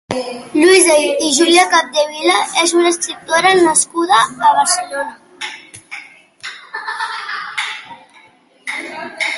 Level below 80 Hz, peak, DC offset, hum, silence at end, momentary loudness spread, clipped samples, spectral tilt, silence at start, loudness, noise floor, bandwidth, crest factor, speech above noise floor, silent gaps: -60 dBFS; 0 dBFS; under 0.1%; none; 0 s; 20 LU; under 0.1%; -1 dB/octave; 0.1 s; -13 LUFS; -48 dBFS; 12 kHz; 16 dB; 35 dB; none